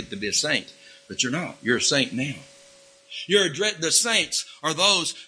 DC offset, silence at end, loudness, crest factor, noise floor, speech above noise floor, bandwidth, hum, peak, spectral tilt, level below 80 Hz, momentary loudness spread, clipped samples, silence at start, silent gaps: under 0.1%; 0 s; -22 LUFS; 22 dB; -52 dBFS; 28 dB; 11 kHz; none; -4 dBFS; -1.5 dB/octave; -64 dBFS; 12 LU; under 0.1%; 0 s; none